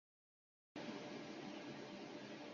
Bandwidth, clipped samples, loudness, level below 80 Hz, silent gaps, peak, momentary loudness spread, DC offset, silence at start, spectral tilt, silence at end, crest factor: 7.2 kHz; under 0.1%; -52 LUFS; -88 dBFS; none; -38 dBFS; 2 LU; under 0.1%; 0.75 s; -3.5 dB/octave; 0 s; 14 dB